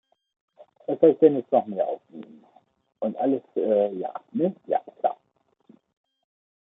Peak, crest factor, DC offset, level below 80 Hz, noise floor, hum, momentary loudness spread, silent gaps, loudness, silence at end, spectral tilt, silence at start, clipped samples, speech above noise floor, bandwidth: -4 dBFS; 22 dB; under 0.1%; -78 dBFS; -70 dBFS; none; 17 LU; none; -24 LUFS; 1.55 s; -11 dB/octave; 0.9 s; under 0.1%; 46 dB; 3.8 kHz